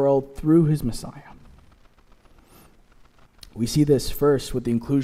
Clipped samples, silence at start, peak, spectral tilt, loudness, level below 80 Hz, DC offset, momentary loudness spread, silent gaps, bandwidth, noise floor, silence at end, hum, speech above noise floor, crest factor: under 0.1%; 0 s; -6 dBFS; -7 dB/octave; -22 LUFS; -42 dBFS; under 0.1%; 15 LU; none; 16 kHz; -53 dBFS; 0 s; none; 32 dB; 16 dB